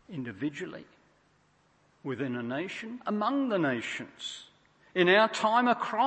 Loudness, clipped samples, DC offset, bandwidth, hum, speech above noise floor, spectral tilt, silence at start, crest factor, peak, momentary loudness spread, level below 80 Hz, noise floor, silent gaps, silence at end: -29 LUFS; under 0.1%; under 0.1%; 8.8 kHz; none; 38 dB; -5 dB/octave; 0.1 s; 22 dB; -8 dBFS; 17 LU; -76 dBFS; -67 dBFS; none; 0 s